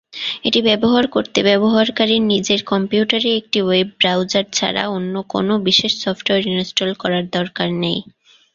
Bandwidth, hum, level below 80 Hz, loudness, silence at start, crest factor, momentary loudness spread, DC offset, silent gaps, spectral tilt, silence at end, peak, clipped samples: 7.6 kHz; none; -56 dBFS; -17 LUFS; 0.15 s; 16 dB; 7 LU; under 0.1%; none; -4 dB/octave; 0.55 s; 0 dBFS; under 0.1%